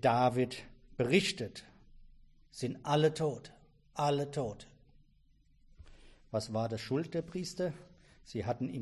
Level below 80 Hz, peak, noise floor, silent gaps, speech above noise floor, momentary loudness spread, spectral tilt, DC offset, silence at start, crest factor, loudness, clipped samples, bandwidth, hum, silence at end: -62 dBFS; -14 dBFS; -66 dBFS; none; 33 dB; 17 LU; -5.5 dB/octave; under 0.1%; 0 s; 22 dB; -34 LUFS; under 0.1%; 11.5 kHz; none; 0 s